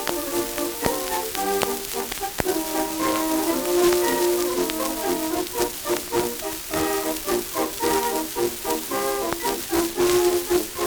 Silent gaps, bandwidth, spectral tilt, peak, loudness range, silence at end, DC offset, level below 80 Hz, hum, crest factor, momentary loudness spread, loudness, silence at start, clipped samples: none; over 20 kHz; -3 dB/octave; -4 dBFS; 2 LU; 0 s; under 0.1%; -48 dBFS; none; 20 dB; 6 LU; -23 LUFS; 0 s; under 0.1%